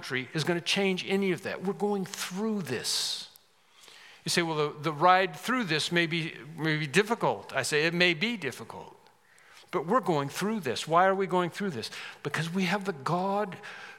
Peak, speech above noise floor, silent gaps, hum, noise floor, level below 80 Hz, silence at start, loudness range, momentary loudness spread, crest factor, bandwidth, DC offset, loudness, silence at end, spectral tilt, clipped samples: -8 dBFS; 31 dB; none; none; -60 dBFS; -82 dBFS; 0 s; 4 LU; 12 LU; 22 dB; 17 kHz; under 0.1%; -29 LUFS; 0 s; -4 dB/octave; under 0.1%